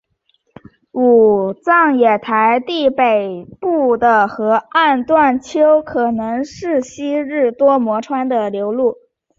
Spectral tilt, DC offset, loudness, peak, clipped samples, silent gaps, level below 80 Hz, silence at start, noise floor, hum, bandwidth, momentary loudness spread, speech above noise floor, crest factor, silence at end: -5.5 dB/octave; under 0.1%; -15 LUFS; -2 dBFS; under 0.1%; none; -56 dBFS; 0.95 s; -63 dBFS; none; 7.6 kHz; 8 LU; 49 dB; 14 dB; 0.45 s